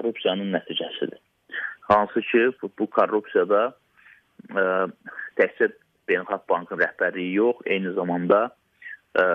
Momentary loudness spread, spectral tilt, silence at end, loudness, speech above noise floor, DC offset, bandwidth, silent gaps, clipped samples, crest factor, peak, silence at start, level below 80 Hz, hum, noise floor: 11 LU; -7.5 dB/octave; 0 s; -24 LUFS; 32 dB; under 0.1%; 5.8 kHz; none; under 0.1%; 18 dB; -6 dBFS; 0 s; -66 dBFS; none; -55 dBFS